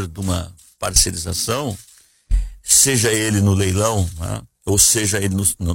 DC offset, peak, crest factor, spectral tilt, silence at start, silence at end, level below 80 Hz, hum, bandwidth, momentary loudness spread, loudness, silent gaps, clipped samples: under 0.1%; 0 dBFS; 18 dB; -3 dB/octave; 0 s; 0 s; -30 dBFS; none; 16.5 kHz; 15 LU; -17 LUFS; none; under 0.1%